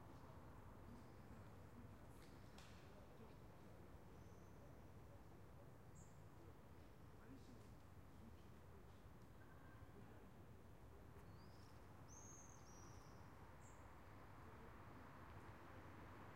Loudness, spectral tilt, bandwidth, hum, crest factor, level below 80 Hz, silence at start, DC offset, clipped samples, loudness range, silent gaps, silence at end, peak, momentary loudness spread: -64 LUFS; -5.5 dB/octave; 16 kHz; none; 18 dB; -72 dBFS; 0 s; under 0.1%; under 0.1%; 2 LU; none; 0 s; -46 dBFS; 4 LU